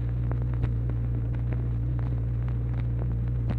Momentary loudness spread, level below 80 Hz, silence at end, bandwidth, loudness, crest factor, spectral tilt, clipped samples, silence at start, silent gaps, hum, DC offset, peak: 1 LU; -32 dBFS; 0 s; 3.8 kHz; -29 LUFS; 14 dB; -11 dB/octave; under 0.1%; 0 s; none; none; under 0.1%; -14 dBFS